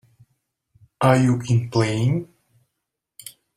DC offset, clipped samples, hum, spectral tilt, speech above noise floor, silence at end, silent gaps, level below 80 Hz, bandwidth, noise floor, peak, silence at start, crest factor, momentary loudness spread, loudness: under 0.1%; under 0.1%; none; -7 dB/octave; 62 dB; 0.25 s; none; -56 dBFS; 15.5 kHz; -81 dBFS; -4 dBFS; 1 s; 20 dB; 23 LU; -20 LUFS